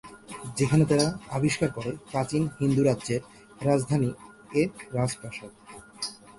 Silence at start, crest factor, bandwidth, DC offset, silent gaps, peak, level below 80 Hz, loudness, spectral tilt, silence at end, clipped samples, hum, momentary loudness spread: 0.05 s; 20 dB; 11.5 kHz; under 0.1%; none; -8 dBFS; -56 dBFS; -27 LUFS; -6 dB/octave; 0.05 s; under 0.1%; none; 17 LU